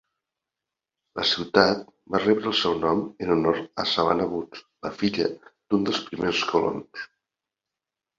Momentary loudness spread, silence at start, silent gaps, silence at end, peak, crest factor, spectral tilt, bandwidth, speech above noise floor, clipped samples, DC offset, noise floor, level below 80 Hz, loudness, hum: 15 LU; 1.15 s; none; 1.15 s; -2 dBFS; 24 dB; -5 dB/octave; 7.6 kHz; 63 dB; under 0.1%; under 0.1%; -88 dBFS; -58 dBFS; -24 LUFS; none